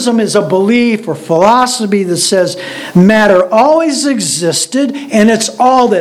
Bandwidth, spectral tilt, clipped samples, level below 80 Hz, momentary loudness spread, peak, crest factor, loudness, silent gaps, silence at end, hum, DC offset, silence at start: 15 kHz; -4.5 dB/octave; 0.6%; -50 dBFS; 6 LU; 0 dBFS; 10 dB; -10 LUFS; none; 0 s; none; under 0.1%; 0 s